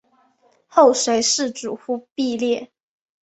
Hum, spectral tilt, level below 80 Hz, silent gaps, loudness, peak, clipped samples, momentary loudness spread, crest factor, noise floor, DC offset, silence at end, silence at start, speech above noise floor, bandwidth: none; -2 dB/octave; -66 dBFS; 2.12-2.16 s; -19 LUFS; -2 dBFS; under 0.1%; 13 LU; 20 dB; -60 dBFS; under 0.1%; 0.6 s; 0.75 s; 41 dB; 8.2 kHz